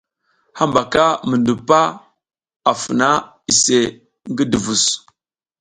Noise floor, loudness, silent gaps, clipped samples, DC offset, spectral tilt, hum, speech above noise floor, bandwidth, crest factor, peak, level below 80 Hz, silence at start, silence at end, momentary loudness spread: -73 dBFS; -16 LUFS; 2.56-2.60 s; under 0.1%; under 0.1%; -3 dB/octave; none; 57 dB; 11 kHz; 18 dB; 0 dBFS; -52 dBFS; 0.55 s; 0.6 s; 7 LU